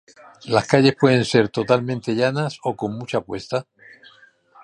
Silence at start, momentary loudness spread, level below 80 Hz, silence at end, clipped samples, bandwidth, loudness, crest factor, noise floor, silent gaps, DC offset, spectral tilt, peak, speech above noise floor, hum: 0.45 s; 12 LU; -58 dBFS; 1 s; under 0.1%; 11 kHz; -20 LUFS; 20 dB; -52 dBFS; none; under 0.1%; -6 dB/octave; 0 dBFS; 32 dB; none